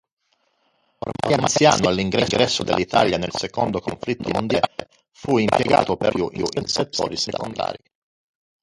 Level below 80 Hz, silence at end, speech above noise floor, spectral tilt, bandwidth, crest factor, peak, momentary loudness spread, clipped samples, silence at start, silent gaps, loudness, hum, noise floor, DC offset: -48 dBFS; 0.85 s; 46 dB; -4 dB/octave; 11.5 kHz; 20 dB; -2 dBFS; 11 LU; under 0.1%; 1.05 s; none; -21 LUFS; none; -67 dBFS; under 0.1%